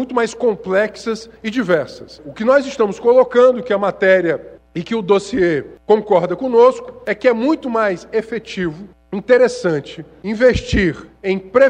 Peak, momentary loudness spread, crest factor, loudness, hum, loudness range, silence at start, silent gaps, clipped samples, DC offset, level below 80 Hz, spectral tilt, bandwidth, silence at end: 0 dBFS; 13 LU; 16 dB; -16 LUFS; none; 3 LU; 0 s; none; under 0.1%; under 0.1%; -40 dBFS; -6 dB/octave; 9.4 kHz; 0 s